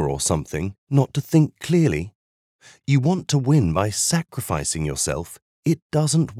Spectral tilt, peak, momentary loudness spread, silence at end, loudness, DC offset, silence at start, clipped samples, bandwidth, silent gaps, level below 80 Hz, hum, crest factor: -5.5 dB/octave; -4 dBFS; 10 LU; 0 s; -21 LUFS; under 0.1%; 0 s; under 0.1%; 15.5 kHz; 0.78-0.87 s, 2.15-2.59 s, 5.42-5.63 s, 5.82-5.90 s; -44 dBFS; none; 18 dB